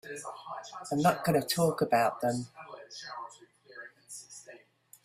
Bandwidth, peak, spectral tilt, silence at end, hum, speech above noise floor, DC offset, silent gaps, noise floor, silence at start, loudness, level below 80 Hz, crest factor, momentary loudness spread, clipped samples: 16 kHz; -12 dBFS; -5 dB/octave; 0.45 s; none; 29 dB; under 0.1%; none; -59 dBFS; 0.05 s; -31 LUFS; -70 dBFS; 20 dB; 21 LU; under 0.1%